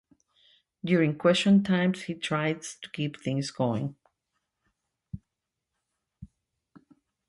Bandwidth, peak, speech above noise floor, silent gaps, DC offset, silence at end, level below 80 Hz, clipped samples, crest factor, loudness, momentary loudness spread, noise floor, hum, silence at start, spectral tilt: 11.5 kHz; -10 dBFS; 59 dB; none; under 0.1%; 1.05 s; -62 dBFS; under 0.1%; 20 dB; -27 LUFS; 19 LU; -85 dBFS; none; 0.85 s; -6 dB/octave